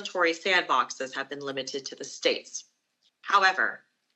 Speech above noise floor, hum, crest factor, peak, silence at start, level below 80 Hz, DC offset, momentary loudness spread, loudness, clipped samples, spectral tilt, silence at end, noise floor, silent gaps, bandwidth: 44 dB; none; 20 dB; -8 dBFS; 0 s; under -90 dBFS; under 0.1%; 17 LU; -26 LUFS; under 0.1%; -1 dB/octave; 0.4 s; -72 dBFS; none; 8.6 kHz